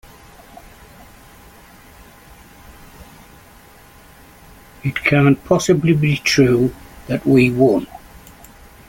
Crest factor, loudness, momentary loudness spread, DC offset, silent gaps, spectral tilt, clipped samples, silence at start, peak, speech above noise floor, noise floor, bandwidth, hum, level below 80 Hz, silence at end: 18 dB; -16 LUFS; 13 LU; under 0.1%; none; -6 dB/octave; under 0.1%; 3 s; -2 dBFS; 30 dB; -45 dBFS; 17 kHz; none; -46 dBFS; 0.9 s